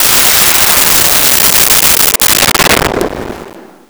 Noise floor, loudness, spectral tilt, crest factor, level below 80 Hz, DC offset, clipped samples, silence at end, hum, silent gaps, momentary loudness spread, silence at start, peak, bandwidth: -31 dBFS; -5 LUFS; -0.5 dB/octave; 8 dB; -30 dBFS; under 0.1%; under 0.1%; 0.25 s; none; none; 11 LU; 0 s; 0 dBFS; over 20 kHz